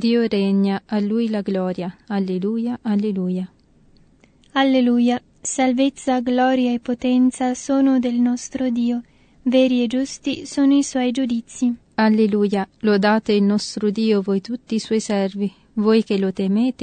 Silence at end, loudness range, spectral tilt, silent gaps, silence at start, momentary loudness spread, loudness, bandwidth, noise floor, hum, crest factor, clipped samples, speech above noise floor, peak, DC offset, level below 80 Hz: 0 s; 3 LU; -5.5 dB/octave; none; 0 s; 8 LU; -20 LUFS; 9.4 kHz; -54 dBFS; none; 14 dB; under 0.1%; 35 dB; -4 dBFS; under 0.1%; -58 dBFS